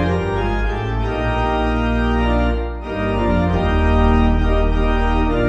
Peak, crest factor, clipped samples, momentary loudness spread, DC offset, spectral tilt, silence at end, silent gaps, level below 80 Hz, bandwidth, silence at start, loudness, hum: -4 dBFS; 12 dB; under 0.1%; 6 LU; under 0.1%; -8 dB/octave; 0 s; none; -20 dBFS; 7.8 kHz; 0 s; -19 LUFS; none